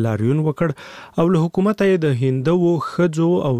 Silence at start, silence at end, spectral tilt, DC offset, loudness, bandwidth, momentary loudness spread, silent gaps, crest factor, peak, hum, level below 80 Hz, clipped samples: 0 s; 0 s; -8 dB/octave; 0.2%; -18 LUFS; 10.5 kHz; 6 LU; none; 14 dB; -4 dBFS; none; -52 dBFS; under 0.1%